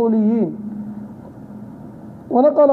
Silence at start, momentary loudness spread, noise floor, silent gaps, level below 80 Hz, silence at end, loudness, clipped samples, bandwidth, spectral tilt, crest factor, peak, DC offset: 0 s; 21 LU; -36 dBFS; none; -60 dBFS; 0 s; -18 LUFS; under 0.1%; 4.3 kHz; -11 dB/octave; 14 dB; -4 dBFS; under 0.1%